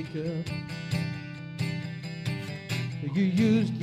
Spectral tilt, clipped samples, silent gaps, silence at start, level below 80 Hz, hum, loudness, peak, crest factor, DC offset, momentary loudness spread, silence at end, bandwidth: -7 dB/octave; under 0.1%; none; 0 s; -62 dBFS; none; -30 LUFS; -14 dBFS; 16 dB; under 0.1%; 11 LU; 0 s; 15.5 kHz